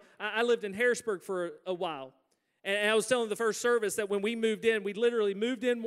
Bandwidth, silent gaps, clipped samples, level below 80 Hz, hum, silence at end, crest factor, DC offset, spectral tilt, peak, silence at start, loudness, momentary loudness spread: 15 kHz; none; under 0.1%; -80 dBFS; none; 0 s; 16 dB; under 0.1%; -3 dB/octave; -14 dBFS; 0.2 s; -30 LUFS; 8 LU